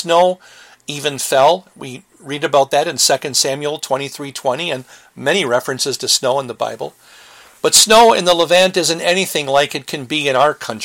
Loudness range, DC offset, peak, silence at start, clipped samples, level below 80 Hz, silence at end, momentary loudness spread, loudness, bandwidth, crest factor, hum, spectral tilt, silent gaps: 6 LU; under 0.1%; 0 dBFS; 0 s; under 0.1%; -56 dBFS; 0 s; 16 LU; -15 LUFS; 17 kHz; 16 dB; none; -2 dB/octave; none